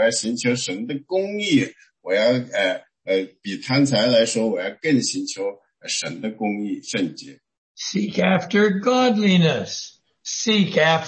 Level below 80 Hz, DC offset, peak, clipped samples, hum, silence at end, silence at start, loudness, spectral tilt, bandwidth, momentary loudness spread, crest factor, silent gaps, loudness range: -66 dBFS; under 0.1%; -4 dBFS; under 0.1%; none; 0 s; 0 s; -21 LUFS; -4.5 dB/octave; 8.8 kHz; 13 LU; 16 dB; 7.58-7.75 s; 5 LU